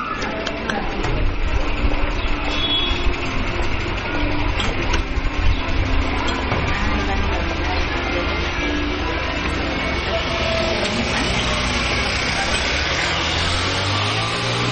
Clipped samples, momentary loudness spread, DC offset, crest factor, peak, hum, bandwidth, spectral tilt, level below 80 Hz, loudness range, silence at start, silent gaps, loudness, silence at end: under 0.1%; 5 LU; under 0.1%; 14 dB; -6 dBFS; none; 9.4 kHz; -4 dB/octave; -24 dBFS; 3 LU; 0 s; none; -21 LUFS; 0 s